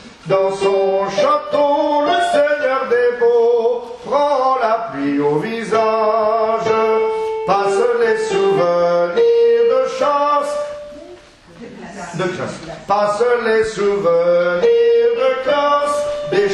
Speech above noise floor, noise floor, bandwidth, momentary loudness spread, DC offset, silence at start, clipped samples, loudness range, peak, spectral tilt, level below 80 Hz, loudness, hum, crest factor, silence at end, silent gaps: 25 dB; -41 dBFS; 11 kHz; 8 LU; under 0.1%; 0 s; under 0.1%; 5 LU; -2 dBFS; -5 dB/octave; -54 dBFS; -16 LUFS; none; 14 dB; 0 s; none